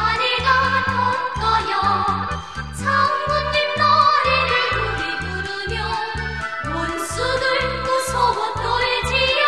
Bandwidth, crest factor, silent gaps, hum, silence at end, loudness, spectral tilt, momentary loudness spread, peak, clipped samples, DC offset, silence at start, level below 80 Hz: 13 kHz; 16 dB; none; none; 0 s; -19 LUFS; -3.5 dB/octave; 9 LU; -4 dBFS; under 0.1%; 0.5%; 0 s; -36 dBFS